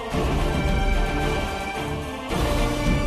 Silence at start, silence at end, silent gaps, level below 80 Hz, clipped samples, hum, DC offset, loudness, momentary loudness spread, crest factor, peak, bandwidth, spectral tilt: 0 s; 0 s; none; -26 dBFS; under 0.1%; none; under 0.1%; -25 LUFS; 5 LU; 12 dB; -10 dBFS; 14 kHz; -5.5 dB/octave